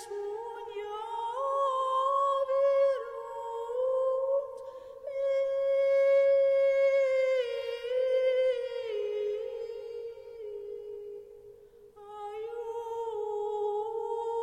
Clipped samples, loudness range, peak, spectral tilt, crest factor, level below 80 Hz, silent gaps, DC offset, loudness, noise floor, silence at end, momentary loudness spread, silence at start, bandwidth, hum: under 0.1%; 13 LU; -18 dBFS; -2.5 dB/octave; 12 dB; -72 dBFS; none; under 0.1%; -30 LUFS; -54 dBFS; 0 s; 17 LU; 0 s; 9.4 kHz; none